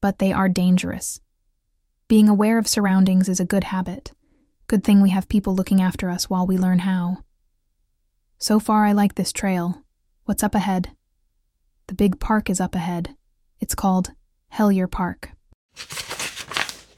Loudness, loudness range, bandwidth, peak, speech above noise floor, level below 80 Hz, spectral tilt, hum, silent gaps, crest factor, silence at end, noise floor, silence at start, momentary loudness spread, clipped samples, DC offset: -21 LUFS; 5 LU; 15.5 kHz; -2 dBFS; 50 dB; -42 dBFS; -5.5 dB/octave; none; 15.54-15.69 s; 20 dB; 0.2 s; -70 dBFS; 0 s; 15 LU; under 0.1%; under 0.1%